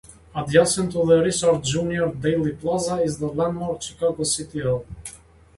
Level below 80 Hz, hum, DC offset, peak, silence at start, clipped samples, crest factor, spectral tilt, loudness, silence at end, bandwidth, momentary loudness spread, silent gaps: -48 dBFS; none; under 0.1%; -2 dBFS; 0.1 s; under 0.1%; 20 dB; -4.5 dB/octave; -22 LUFS; 0.4 s; 11.5 kHz; 11 LU; none